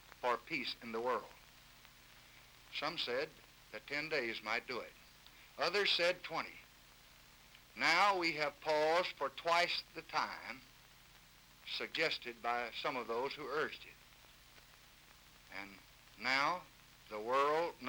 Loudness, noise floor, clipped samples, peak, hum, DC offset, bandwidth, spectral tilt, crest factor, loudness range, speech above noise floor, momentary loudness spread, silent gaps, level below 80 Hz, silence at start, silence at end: -37 LUFS; -63 dBFS; under 0.1%; -16 dBFS; 60 Hz at -75 dBFS; under 0.1%; over 20 kHz; -2.5 dB/octave; 24 dB; 8 LU; 25 dB; 21 LU; none; -72 dBFS; 0.1 s; 0 s